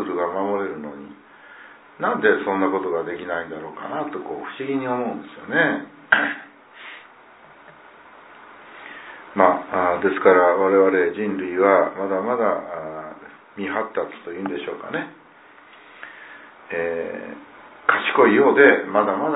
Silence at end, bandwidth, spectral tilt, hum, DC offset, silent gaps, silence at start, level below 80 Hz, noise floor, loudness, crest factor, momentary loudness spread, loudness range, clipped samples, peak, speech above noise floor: 0 s; 4 kHz; -9.5 dB/octave; none; under 0.1%; none; 0 s; -68 dBFS; -48 dBFS; -21 LUFS; 22 dB; 23 LU; 12 LU; under 0.1%; 0 dBFS; 28 dB